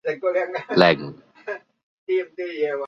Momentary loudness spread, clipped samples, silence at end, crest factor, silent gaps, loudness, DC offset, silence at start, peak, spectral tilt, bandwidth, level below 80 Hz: 20 LU; under 0.1%; 0 s; 24 dB; 1.83-2.07 s; -22 LUFS; under 0.1%; 0.05 s; 0 dBFS; -6.5 dB/octave; 7.2 kHz; -62 dBFS